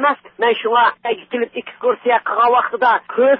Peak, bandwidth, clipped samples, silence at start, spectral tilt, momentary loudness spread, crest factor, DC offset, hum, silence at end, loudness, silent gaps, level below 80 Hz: -2 dBFS; 5.4 kHz; under 0.1%; 0 s; -8 dB/octave; 8 LU; 14 dB; under 0.1%; none; 0 s; -17 LUFS; none; -66 dBFS